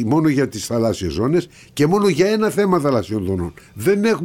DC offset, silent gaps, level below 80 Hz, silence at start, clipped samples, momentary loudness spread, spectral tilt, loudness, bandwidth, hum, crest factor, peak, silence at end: under 0.1%; none; -44 dBFS; 0 s; under 0.1%; 7 LU; -6 dB/octave; -18 LUFS; 17 kHz; none; 14 dB; -4 dBFS; 0 s